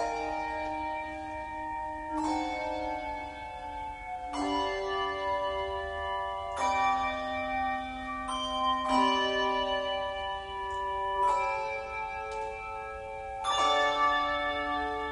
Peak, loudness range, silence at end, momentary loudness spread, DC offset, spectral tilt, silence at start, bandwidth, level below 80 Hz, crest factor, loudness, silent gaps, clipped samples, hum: -16 dBFS; 5 LU; 0 s; 12 LU; under 0.1%; -3.5 dB/octave; 0 s; 10.5 kHz; -52 dBFS; 16 dB; -31 LUFS; none; under 0.1%; none